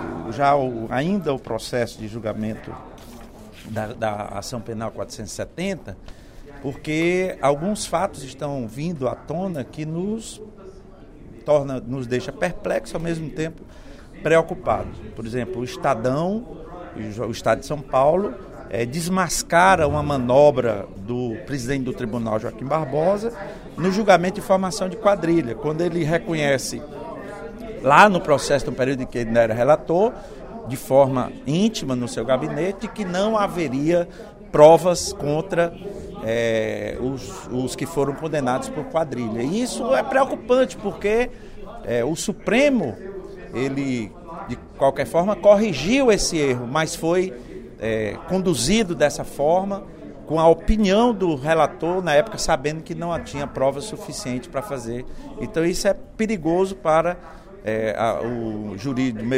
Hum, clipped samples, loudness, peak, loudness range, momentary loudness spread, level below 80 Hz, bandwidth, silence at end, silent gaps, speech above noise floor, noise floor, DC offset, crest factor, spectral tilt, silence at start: none; under 0.1%; -21 LUFS; 0 dBFS; 8 LU; 16 LU; -42 dBFS; 16 kHz; 0 s; none; 21 dB; -43 dBFS; under 0.1%; 22 dB; -5 dB/octave; 0 s